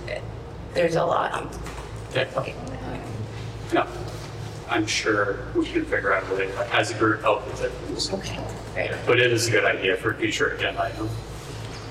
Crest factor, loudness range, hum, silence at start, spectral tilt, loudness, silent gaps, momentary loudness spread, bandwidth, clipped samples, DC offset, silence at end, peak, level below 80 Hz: 20 dB; 5 LU; none; 0 s; -4.5 dB/octave; -25 LUFS; none; 14 LU; 15 kHz; under 0.1%; under 0.1%; 0 s; -6 dBFS; -44 dBFS